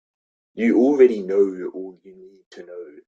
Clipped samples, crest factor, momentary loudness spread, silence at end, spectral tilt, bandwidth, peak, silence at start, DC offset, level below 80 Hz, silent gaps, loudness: under 0.1%; 18 dB; 23 LU; 0.2 s; -7.5 dB/octave; 7.2 kHz; -4 dBFS; 0.55 s; under 0.1%; -68 dBFS; 2.46-2.51 s; -18 LUFS